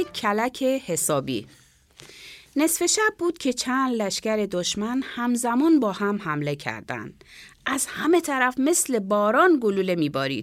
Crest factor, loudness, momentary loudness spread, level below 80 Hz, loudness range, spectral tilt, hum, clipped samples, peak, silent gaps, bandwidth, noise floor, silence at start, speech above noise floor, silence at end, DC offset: 18 dB; -23 LUFS; 12 LU; -62 dBFS; 3 LU; -3.5 dB/octave; none; under 0.1%; -6 dBFS; none; 16.5 kHz; -51 dBFS; 0 s; 27 dB; 0 s; under 0.1%